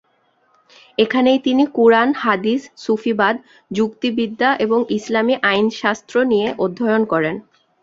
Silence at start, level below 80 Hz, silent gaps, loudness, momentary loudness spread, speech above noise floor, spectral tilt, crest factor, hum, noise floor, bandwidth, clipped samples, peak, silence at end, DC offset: 1 s; -60 dBFS; none; -17 LUFS; 8 LU; 44 dB; -5.5 dB/octave; 16 dB; none; -61 dBFS; 7.8 kHz; under 0.1%; -2 dBFS; 0.4 s; under 0.1%